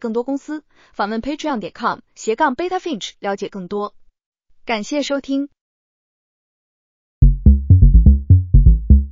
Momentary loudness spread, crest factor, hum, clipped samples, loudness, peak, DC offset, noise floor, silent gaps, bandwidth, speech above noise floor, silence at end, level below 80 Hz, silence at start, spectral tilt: 14 LU; 16 dB; none; under 0.1%; -17 LUFS; 0 dBFS; under 0.1%; under -90 dBFS; 4.26-4.32 s, 5.61-7.21 s; 7.6 kHz; over 68 dB; 0 s; -18 dBFS; 0.05 s; -7 dB/octave